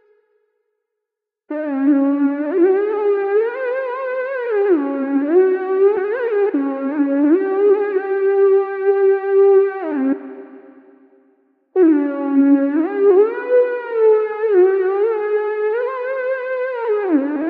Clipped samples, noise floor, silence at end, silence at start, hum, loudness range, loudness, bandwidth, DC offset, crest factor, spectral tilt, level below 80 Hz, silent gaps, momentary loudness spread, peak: under 0.1%; -82 dBFS; 0 s; 1.5 s; none; 3 LU; -17 LUFS; 4.2 kHz; under 0.1%; 14 dB; -8.5 dB/octave; -80 dBFS; none; 8 LU; -4 dBFS